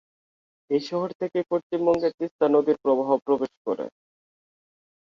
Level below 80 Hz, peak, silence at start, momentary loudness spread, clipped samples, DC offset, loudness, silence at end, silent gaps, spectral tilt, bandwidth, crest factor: -68 dBFS; -8 dBFS; 0.7 s; 9 LU; under 0.1%; under 0.1%; -25 LUFS; 1.15 s; 1.15-1.20 s, 1.63-1.70 s, 2.14-2.18 s, 2.31-2.39 s, 3.57-3.65 s; -7.5 dB/octave; 7.4 kHz; 18 dB